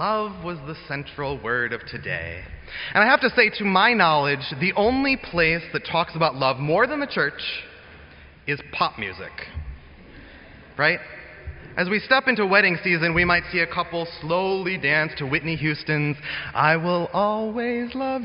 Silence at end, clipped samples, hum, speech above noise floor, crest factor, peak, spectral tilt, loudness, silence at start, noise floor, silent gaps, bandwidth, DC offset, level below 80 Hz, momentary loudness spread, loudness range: 0 s; under 0.1%; none; 24 dB; 20 dB; -4 dBFS; -3 dB/octave; -22 LUFS; 0 s; -46 dBFS; none; 5.6 kHz; under 0.1%; -46 dBFS; 16 LU; 8 LU